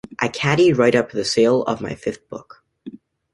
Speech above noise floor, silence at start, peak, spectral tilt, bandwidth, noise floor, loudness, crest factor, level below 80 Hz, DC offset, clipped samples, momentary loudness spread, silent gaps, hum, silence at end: 21 dB; 0.2 s; -2 dBFS; -5 dB/octave; 11.5 kHz; -40 dBFS; -18 LUFS; 18 dB; -54 dBFS; under 0.1%; under 0.1%; 23 LU; none; none; 0.35 s